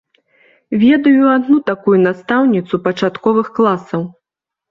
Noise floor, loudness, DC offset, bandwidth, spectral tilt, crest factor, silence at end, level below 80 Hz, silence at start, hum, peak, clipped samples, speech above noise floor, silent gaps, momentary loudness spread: -84 dBFS; -14 LUFS; under 0.1%; 7 kHz; -8 dB/octave; 12 dB; 0.6 s; -58 dBFS; 0.7 s; none; -2 dBFS; under 0.1%; 71 dB; none; 10 LU